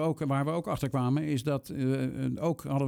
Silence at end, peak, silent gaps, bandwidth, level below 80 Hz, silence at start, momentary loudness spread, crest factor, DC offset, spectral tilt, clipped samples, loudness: 0 s; -16 dBFS; none; 16.5 kHz; -58 dBFS; 0 s; 3 LU; 14 dB; under 0.1%; -7.5 dB/octave; under 0.1%; -31 LUFS